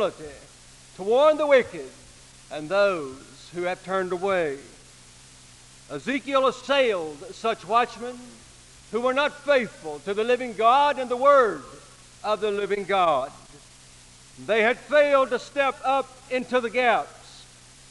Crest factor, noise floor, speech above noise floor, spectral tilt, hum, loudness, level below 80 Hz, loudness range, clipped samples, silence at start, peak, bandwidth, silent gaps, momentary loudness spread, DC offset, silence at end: 18 dB; -50 dBFS; 26 dB; -4 dB/octave; none; -23 LUFS; -58 dBFS; 6 LU; under 0.1%; 0 s; -6 dBFS; 11.5 kHz; none; 19 LU; under 0.1%; 0.5 s